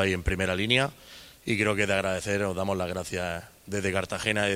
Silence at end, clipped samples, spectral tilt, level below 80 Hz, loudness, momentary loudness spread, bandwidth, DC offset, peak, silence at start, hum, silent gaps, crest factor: 0 s; under 0.1%; -4.5 dB/octave; -46 dBFS; -27 LUFS; 11 LU; 16 kHz; under 0.1%; -6 dBFS; 0 s; none; none; 22 dB